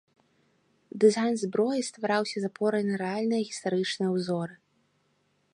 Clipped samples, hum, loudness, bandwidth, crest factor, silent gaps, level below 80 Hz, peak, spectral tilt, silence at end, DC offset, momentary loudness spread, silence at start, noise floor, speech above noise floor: under 0.1%; none; -28 LUFS; 11 kHz; 20 dB; none; -78 dBFS; -10 dBFS; -5 dB/octave; 1 s; under 0.1%; 8 LU; 0.95 s; -71 dBFS; 44 dB